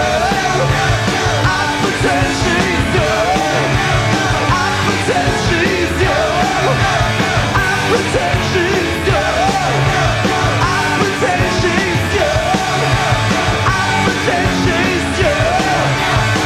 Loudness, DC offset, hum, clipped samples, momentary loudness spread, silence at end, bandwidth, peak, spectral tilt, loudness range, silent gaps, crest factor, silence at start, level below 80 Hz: -14 LUFS; under 0.1%; none; under 0.1%; 1 LU; 0 s; 15.5 kHz; 0 dBFS; -4.5 dB/octave; 0 LU; none; 14 dB; 0 s; -28 dBFS